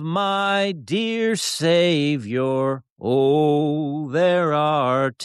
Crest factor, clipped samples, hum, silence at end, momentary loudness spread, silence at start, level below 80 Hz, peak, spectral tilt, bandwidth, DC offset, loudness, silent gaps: 12 dB; under 0.1%; none; 0 s; 6 LU; 0 s; -68 dBFS; -8 dBFS; -5 dB/octave; 13 kHz; under 0.1%; -20 LUFS; 2.90-2.96 s